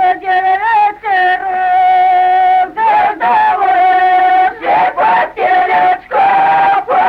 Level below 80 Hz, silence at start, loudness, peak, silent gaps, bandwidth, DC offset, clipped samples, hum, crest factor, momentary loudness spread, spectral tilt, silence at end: -50 dBFS; 0 s; -10 LUFS; -2 dBFS; none; 5.2 kHz; under 0.1%; under 0.1%; none; 8 dB; 3 LU; -4.5 dB/octave; 0 s